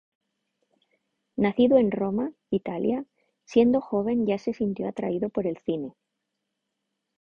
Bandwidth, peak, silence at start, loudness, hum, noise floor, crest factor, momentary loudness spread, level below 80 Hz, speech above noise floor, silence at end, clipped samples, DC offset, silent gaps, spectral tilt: 6.8 kHz; -8 dBFS; 1.35 s; -26 LUFS; none; -82 dBFS; 20 dB; 11 LU; -62 dBFS; 57 dB; 1.3 s; under 0.1%; under 0.1%; none; -8 dB/octave